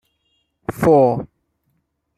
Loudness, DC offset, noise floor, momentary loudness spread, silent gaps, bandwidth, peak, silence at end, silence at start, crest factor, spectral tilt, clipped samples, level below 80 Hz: -16 LUFS; under 0.1%; -69 dBFS; 19 LU; none; 15 kHz; -2 dBFS; 0.95 s; 0.7 s; 18 dB; -8.5 dB/octave; under 0.1%; -50 dBFS